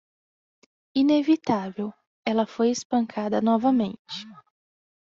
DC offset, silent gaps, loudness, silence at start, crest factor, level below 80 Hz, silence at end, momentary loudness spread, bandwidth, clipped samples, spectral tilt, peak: under 0.1%; 2.07-2.23 s, 2.85-2.90 s, 3.99-4.05 s; -24 LUFS; 0.95 s; 16 dB; -68 dBFS; 0.7 s; 15 LU; 7.6 kHz; under 0.1%; -5 dB/octave; -10 dBFS